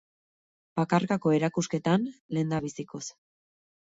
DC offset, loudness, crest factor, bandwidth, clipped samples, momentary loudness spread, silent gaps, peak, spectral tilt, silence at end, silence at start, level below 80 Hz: under 0.1%; -28 LUFS; 20 dB; 8 kHz; under 0.1%; 12 LU; 2.20-2.29 s; -10 dBFS; -6 dB/octave; 0.85 s; 0.75 s; -66 dBFS